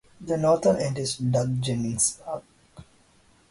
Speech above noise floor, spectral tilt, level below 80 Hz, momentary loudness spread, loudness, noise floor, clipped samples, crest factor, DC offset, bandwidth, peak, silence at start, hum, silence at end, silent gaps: 35 dB; -5 dB/octave; -56 dBFS; 13 LU; -25 LUFS; -59 dBFS; under 0.1%; 18 dB; under 0.1%; 11.5 kHz; -10 dBFS; 0.2 s; none; 0.7 s; none